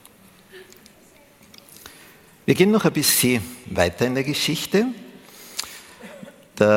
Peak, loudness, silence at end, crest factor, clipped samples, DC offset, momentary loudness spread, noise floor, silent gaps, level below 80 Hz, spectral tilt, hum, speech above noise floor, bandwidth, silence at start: -2 dBFS; -21 LUFS; 0 s; 22 dB; under 0.1%; under 0.1%; 25 LU; -52 dBFS; none; -54 dBFS; -4 dB/octave; none; 32 dB; 17 kHz; 0.55 s